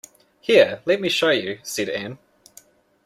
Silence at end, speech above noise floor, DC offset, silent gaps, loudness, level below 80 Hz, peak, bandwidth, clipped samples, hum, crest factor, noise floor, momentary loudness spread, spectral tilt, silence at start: 0.9 s; 32 dB; under 0.1%; none; -20 LUFS; -66 dBFS; -2 dBFS; 15.5 kHz; under 0.1%; none; 20 dB; -52 dBFS; 14 LU; -3.5 dB/octave; 0.5 s